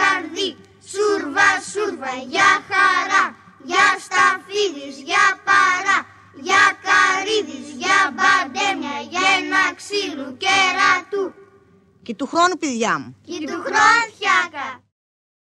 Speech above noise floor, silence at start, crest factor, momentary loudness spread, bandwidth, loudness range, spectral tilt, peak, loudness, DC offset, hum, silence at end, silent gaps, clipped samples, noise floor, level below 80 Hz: 36 dB; 0 s; 18 dB; 12 LU; 12 kHz; 3 LU; -1.5 dB/octave; -2 dBFS; -17 LUFS; under 0.1%; none; 0.8 s; none; under 0.1%; -53 dBFS; -70 dBFS